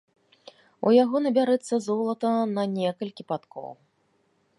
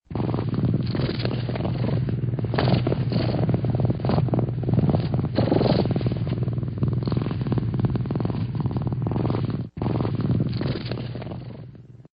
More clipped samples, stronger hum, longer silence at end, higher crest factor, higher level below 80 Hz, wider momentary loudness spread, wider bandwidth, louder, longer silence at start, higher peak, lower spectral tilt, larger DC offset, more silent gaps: neither; neither; first, 0.85 s vs 0.1 s; about the same, 18 dB vs 20 dB; second, -80 dBFS vs -42 dBFS; first, 15 LU vs 6 LU; first, 11.5 kHz vs 5.2 kHz; about the same, -25 LUFS vs -25 LUFS; first, 0.8 s vs 0.1 s; second, -8 dBFS vs -4 dBFS; about the same, -6.5 dB/octave vs -7.5 dB/octave; neither; neither